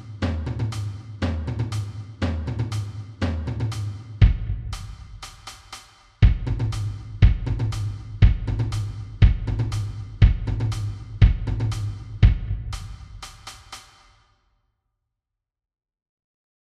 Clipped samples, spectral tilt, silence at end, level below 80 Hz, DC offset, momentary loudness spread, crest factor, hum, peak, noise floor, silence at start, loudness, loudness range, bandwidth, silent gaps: under 0.1%; -7 dB/octave; 2.9 s; -26 dBFS; under 0.1%; 19 LU; 22 dB; none; -2 dBFS; -85 dBFS; 0 s; -24 LUFS; 5 LU; 11 kHz; none